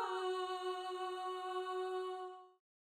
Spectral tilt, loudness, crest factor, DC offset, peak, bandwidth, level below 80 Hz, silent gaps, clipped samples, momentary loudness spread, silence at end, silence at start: -1.5 dB/octave; -42 LUFS; 12 dB; under 0.1%; -30 dBFS; 14.5 kHz; -90 dBFS; none; under 0.1%; 8 LU; 0.45 s; 0 s